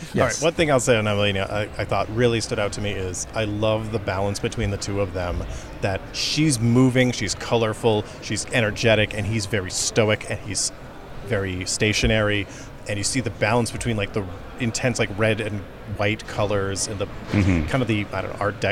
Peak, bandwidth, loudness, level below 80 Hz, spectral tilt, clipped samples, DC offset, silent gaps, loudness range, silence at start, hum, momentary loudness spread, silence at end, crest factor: -4 dBFS; 15.5 kHz; -23 LUFS; -40 dBFS; -4.5 dB/octave; under 0.1%; under 0.1%; none; 4 LU; 0 s; none; 9 LU; 0 s; 18 dB